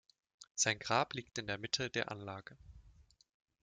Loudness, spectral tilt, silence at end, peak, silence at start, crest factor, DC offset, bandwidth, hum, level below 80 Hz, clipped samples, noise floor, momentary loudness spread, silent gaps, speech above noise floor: -37 LUFS; -2 dB/octave; 0.6 s; -18 dBFS; 0.4 s; 24 dB; under 0.1%; 9.6 kHz; none; -68 dBFS; under 0.1%; -65 dBFS; 14 LU; 0.51-0.55 s; 27 dB